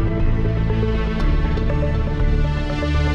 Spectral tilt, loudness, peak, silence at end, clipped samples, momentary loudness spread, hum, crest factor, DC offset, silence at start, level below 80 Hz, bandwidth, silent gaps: -8 dB/octave; -21 LUFS; -8 dBFS; 0 s; under 0.1%; 1 LU; none; 10 dB; under 0.1%; 0 s; -20 dBFS; 7 kHz; none